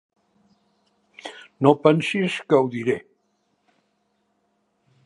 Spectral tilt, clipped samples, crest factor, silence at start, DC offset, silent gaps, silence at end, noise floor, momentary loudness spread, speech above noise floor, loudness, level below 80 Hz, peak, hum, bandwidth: -6.5 dB/octave; under 0.1%; 24 dB; 1.25 s; under 0.1%; none; 2.05 s; -70 dBFS; 22 LU; 50 dB; -21 LUFS; -70 dBFS; -2 dBFS; none; 11.5 kHz